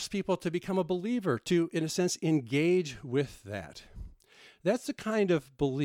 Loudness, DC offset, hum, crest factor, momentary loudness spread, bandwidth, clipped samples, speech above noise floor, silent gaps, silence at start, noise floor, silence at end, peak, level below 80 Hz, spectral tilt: -31 LUFS; under 0.1%; none; 14 dB; 13 LU; 16 kHz; under 0.1%; 28 dB; none; 0 s; -59 dBFS; 0 s; -16 dBFS; -58 dBFS; -5.5 dB/octave